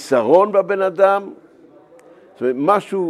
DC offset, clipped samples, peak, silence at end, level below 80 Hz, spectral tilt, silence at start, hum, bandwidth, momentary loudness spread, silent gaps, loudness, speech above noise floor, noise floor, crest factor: under 0.1%; under 0.1%; 0 dBFS; 0 s; -74 dBFS; -6 dB/octave; 0 s; none; 12.5 kHz; 10 LU; none; -16 LUFS; 31 dB; -47 dBFS; 18 dB